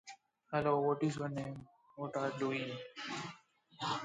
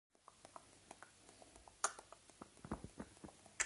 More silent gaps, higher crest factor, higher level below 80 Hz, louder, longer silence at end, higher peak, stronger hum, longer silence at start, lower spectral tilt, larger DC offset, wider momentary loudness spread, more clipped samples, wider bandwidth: neither; second, 18 dB vs 32 dB; second, -74 dBFS vs -68 dBFS; first, -38 LUFS vs -51 LUFS; about the same, 0 s vs 0 s; about the same, -20 dBFS vs -20 dBFS; neither; second, 0.05 s vs 0.3 s; first, -5.5 dB/octave vs -2 dB/octave; neither; second, 15 LU vs 19 LU; neither; second, 9.4 kHz vs 11.5 kHz